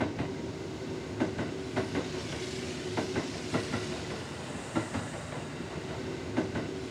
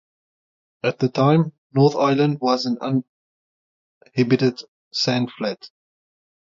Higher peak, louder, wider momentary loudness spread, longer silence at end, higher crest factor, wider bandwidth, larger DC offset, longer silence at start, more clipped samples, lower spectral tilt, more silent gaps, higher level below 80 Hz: second, -16 dBFS vs -4 dBFS; second, -35 LUFS vs -21 LUFS; second, 6 LU vs 11 LU; second, 0 s vs 0.85 s; about the same, 20 dB vs 18 dB; first, 13.5 kHz vs 7.4 kHz; neither; second, 0 s vs 0.85 s; neither; second, -5 dB/octave vs -6.5 dB/octave; second, none vs 1.58-1.70 s, 3.08-4.01 s, 4.68-4.91 s; first, -54 dBFS vs -66 dBFS